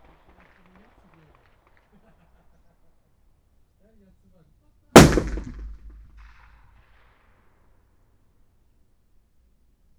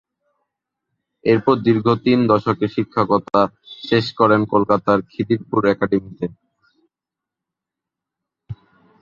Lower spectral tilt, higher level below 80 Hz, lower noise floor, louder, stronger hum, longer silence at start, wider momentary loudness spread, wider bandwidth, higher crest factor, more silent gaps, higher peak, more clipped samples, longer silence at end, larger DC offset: second, -5 dB/octave vs -8 dB/octave; first, -38 dBFS vs -54 dBFS; second, -61 dBFS vs -86 dBFS; first, -15 LUFS vs -18 LUFS; neither; first, 4.95 s vs 1.25 s; first, 30 LU vs 13 LU; first, over 20 kHz vs 7.2 kHz; first, 26 dB vs 18 dB; neither; about the same, 0 dBFS vs -2 dBFS; neither; first, 4.3 s vs 0.5 s; neither